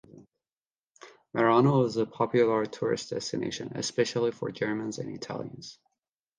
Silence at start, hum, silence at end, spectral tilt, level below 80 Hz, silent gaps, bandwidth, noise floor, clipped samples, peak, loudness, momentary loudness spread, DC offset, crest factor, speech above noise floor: 0.15 s; none; 0.65 s; -5.5 dB/octave; -68 dBFS; 0.62-0.66 s, 0.78-0.95 s; 10 kHz; under -90 dBFS; under 0.1%; -10 dBFS; -28 LUFS; 14 LU; under 0.1%; 20 dB; over 62 dB